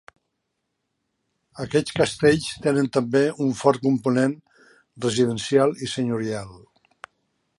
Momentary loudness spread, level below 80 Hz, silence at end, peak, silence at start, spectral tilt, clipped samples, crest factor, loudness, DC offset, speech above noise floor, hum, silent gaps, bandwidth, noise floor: 9 LU; -56 dBFS; 1 s; -4 dBFS; 1.55 s; -5.5 dB/octave; under 0.1%; 20 dB; -22 LUFS; under 0.1%; 56 dB; none; none; 11.5 kHz; -77 dBFS